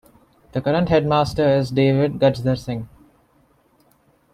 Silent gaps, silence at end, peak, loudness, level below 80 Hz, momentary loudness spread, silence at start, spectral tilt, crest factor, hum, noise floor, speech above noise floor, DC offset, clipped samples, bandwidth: none; 1.5 s; -4 dBFS; -19 LUFS; -46 dBFS; 12 LU; 0.55 s; -7.5 dB/octave; 16 dB; none; -59 dBFS; 41 dB; under 0.1%; under 0.1%; 13 kHz